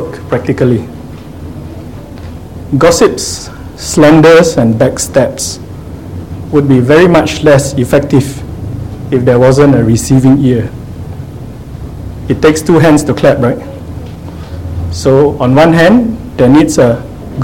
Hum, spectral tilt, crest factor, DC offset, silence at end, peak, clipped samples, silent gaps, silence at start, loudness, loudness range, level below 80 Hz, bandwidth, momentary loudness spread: none; -6 dB/octave; 10 dB; 0.8%; 0 s; 0 dBFS; 1%; none; 0 s; -8 LUFS; 3 LU; -30 dBFS; 17 kHz; 20 LU